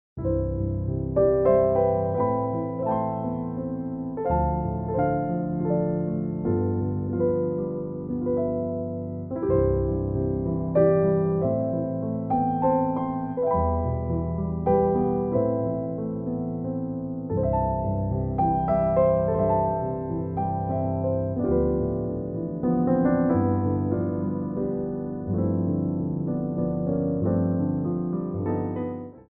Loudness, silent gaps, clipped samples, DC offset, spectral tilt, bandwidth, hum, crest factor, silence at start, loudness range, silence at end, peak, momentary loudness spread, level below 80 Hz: -25 LUFS; none; under 0.1%; under 0.1%; -12 dB/octave; 2.8 kHz; none; 16 dB; 0.15 s; 3 LU; 0.1 s; -8 dBFS; 8 LU; -40 dBFS